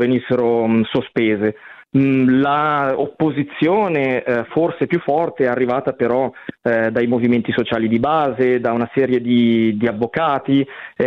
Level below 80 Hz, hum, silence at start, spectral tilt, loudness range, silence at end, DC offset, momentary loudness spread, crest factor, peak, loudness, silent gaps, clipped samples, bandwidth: -56 dBFS; none; 0 s; -9 dB/octave; 1 LU; 0 s; under 0.1%; 5 LU; 14 dB; -4 dBFS; -17 LUFS; none; under 0.1%; 5 kHz